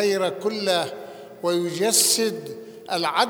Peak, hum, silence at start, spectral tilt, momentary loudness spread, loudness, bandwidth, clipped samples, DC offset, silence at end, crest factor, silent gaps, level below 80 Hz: -4 dBFS; none; 0 s; -2 dB/octave; 20 LU; -22 LUFS; over 20 kHz; under 0.1%; under 0.1%; 0 s; 20 dB; none; -76 dBFS